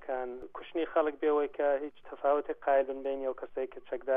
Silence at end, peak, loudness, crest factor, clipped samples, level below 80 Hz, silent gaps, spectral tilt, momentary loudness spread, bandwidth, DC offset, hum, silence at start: 0 s; -16 dBFS; -32 LUFS; 16 dB; under 0.1%; -64 dBFS; none; -7 dB/octave; 10 LU; 3.7 kHz; under 0.1%; none; 0 s